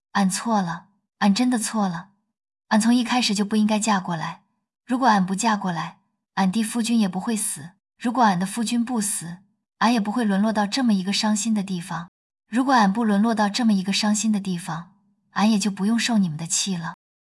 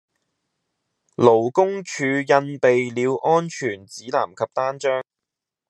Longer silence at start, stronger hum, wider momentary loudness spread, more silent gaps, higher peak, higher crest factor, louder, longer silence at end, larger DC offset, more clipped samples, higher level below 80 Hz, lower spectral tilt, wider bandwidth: second, 0.15 s vs 1.2 s; neither; about the same, 11 LU vs 11 LU; first, 12.08-12.30 s vs none; second, -6 dBFS vs -2 dBFS; about the same, 16 dB vs 20 dB; about the same, -22 LUFS vs -21 LUFS; second, 0.35 s vs 0.7 s; neither; neither; about the same, -68 dBFS vs -72 dBFS; second, -4 dB/octave vs -5.5 dB/octave; first, 12 kHz vs 10 kHz